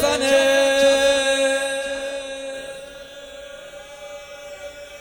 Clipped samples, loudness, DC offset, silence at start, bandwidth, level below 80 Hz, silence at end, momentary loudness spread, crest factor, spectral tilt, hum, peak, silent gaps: under 0.1%; -18 LUFS; under 0.1%; 0 s; 19 kHz; -52 dBFS; 0 s; 22 LU; 18 dB; -1.5 dB/octave; none; -4 dBFS; none